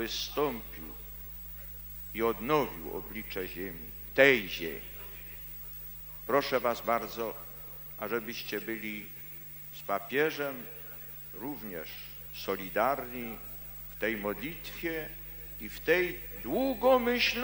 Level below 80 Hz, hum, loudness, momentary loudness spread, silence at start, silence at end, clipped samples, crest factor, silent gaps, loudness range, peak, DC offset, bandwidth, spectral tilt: -54 dBFS; 50 Hz at -55 dBFS; -33 LUFS; 14 LU; 0 s; 0 s; under 0.1%; 26 dB; none; 6 LU; -8 dBFS; under 0.1%; 17.5 kHz; -4 dB/octave